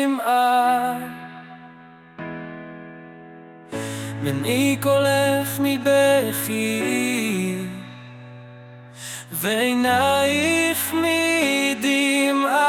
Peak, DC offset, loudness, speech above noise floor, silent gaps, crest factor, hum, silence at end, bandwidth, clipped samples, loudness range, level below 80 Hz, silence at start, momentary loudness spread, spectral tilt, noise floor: -6 dBFS; under 0.1%; -20 LUFS; 26 dB; none; 16 dB; none; 0 s; 19 kHz; under 0.1%; 10 LU; -64 dBFS; 0 s; 20 LU; -4 dB/octave; -45 dBFS